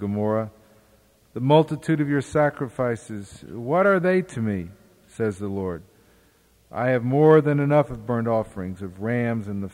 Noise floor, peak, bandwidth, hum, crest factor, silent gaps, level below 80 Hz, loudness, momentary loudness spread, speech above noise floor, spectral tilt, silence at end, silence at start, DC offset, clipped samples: -59 dBFS; -4 dBFS; 12 kHz; none; 18 dB; none; -56 dBFS; -23 LUFS; 17 LU; 37 dB; -8 dB/octave; 0 s; 0 s; under 0.1%; under 0.1%